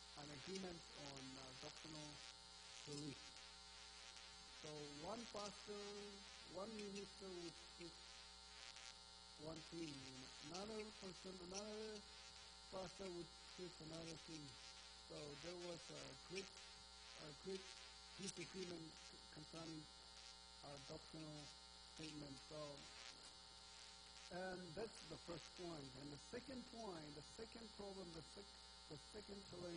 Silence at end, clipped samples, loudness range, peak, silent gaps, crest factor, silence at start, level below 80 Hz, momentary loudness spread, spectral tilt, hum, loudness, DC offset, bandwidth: 0 s; under 0.1%; 2 LU; -36 dBFS; none; 20 dB; 0 s; -74 dBFS; 7 LU; -3.5 dB/octave; none; -56 LUFS; under 0.1%; 10 kHz